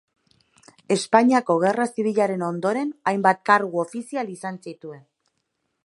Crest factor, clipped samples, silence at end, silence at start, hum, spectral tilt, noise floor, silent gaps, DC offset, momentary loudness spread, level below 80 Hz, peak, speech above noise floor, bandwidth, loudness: 22 dB; under 0.1%; 0.9 s; 0.9 s; none; -5.5 dB/octave; -75 dBFS; none; under 0.1%; 16 LU; -74 dBFS; -2 dBFS; 54 dB; 11.5 kHz; -22 LUFS